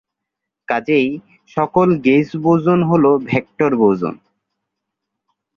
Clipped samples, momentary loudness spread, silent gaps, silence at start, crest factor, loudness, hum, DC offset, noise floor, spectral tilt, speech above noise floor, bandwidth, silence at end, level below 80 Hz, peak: under 0.1%; 9 LU; none; 0.7 s; 16 dB; -16 LUFS; none; under 0.1%; -81 dBFS; -9 dB/octave; 66 dB; 7 kHz; 1.4 s; -56 dBFS; -2 dBFS